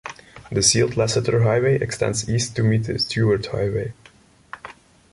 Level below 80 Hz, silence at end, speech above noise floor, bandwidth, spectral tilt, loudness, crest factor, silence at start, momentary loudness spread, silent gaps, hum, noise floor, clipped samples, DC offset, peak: -46 dBFS; 0.4 s; 32 dB; 11.5 kHz; -4.5 dB/octave; -20 LUFS; 18 dB; 0.05 s; 21 LU; none; none; -52 dBFS; under 0.1%; under 0.1%; -2 dBFS